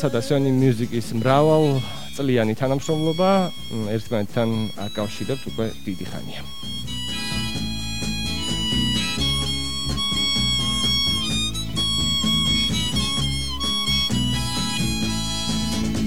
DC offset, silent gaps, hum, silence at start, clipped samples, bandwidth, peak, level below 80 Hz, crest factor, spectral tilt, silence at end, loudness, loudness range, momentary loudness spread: 2%; none; none; 0 s; under 0.1%; 17 kHz; -4 dBFS; -36 dBFS; 20 dB; -4.5 dB/octave; 0 s; -22 LUFS; 7 LU; 9 LU